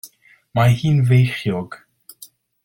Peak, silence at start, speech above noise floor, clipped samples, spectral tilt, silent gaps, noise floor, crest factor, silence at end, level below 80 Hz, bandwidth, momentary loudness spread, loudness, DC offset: -4 dBFS; 0.05 s; 32 dB; under 0.1%; -7 dB/octave; none; -48 dBFS; 16 dB; 0.4 s; -50 dBFS; 17 kHz; 16 LU; -18 LUFS; under 0.1%